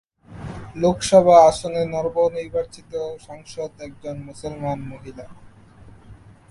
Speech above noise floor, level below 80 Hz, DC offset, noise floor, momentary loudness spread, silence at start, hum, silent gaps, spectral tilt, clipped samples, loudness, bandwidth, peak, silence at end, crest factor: 26 dB; -48 dBFS; under 0.1%; -46 dBFS; 24 LU; 0.3 s; none; none; -5.5 dB/octave; under 0.1%; -19 LUFS; 11.5 kHz; -2 dBFS; 0.35 s; 20 dB